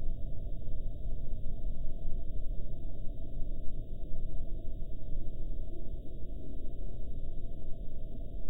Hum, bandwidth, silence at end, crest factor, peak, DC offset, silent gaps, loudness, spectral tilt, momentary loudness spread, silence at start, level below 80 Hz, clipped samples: none; 0.7 kHz; 0 s; 10 dB; -18 dBFS; under 0.1%; none; -45 LUFS; -10.5 dB/octave; 3 LU; 0 s; -36 dBFS; under 0.1%